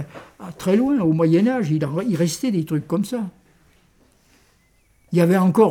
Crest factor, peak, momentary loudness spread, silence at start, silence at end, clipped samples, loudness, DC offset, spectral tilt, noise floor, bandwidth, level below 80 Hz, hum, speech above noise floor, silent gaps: 18 dB; -2 dBFS; 13 LU; 0 s; 0 s; under 0.1%; -20 LUFS; under 0.1%; -7 dB/octave; -59 dBFS; 17 kHz; -58 dBFS; none; 41 dB; none